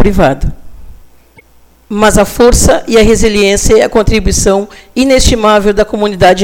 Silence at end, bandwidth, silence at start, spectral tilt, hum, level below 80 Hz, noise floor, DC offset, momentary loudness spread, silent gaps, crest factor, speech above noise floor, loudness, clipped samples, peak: 0 s; 18 kHz; 0 s; -4 dB/octave; none; -18 dBFS; -43 dBFS; under 0.1%; 7 LU; none; 8 dB; 35 dB; -8 LUFS; 0.9%; 0 dBFS